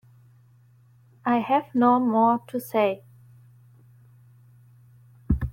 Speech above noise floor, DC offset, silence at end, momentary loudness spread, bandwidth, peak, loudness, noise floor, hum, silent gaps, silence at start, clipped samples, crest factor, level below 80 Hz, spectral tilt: 34 dB; under 0.1%; 0 s; 9 LU; 16.5 kHz; -8 dBFS; -23 LUFS; -56 dBFS; none; none; 1.25 s; under 0.1%; 18 dB; -42 dBFS; -7.5 dB/octave